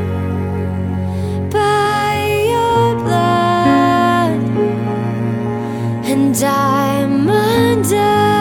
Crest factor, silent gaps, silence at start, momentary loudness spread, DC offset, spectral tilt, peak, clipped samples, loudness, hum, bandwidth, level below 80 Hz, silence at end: 14 dB; none; 0 s; 7 LU; under 0.1%; -6 dB/octave; 0 dBFS; under 0.1%; -15 LUFS; none; 18 kHz; -44 dBFS; 0 s